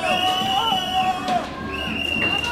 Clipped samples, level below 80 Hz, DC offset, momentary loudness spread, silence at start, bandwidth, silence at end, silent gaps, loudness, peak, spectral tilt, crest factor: under 0.1%; -46 dBFS; under 0.1%; 6 LU; 0 s; 16.5 kHz; 0 s; none; -21 LUFS; -8 dBFS; -3 dB/octave; 14 dB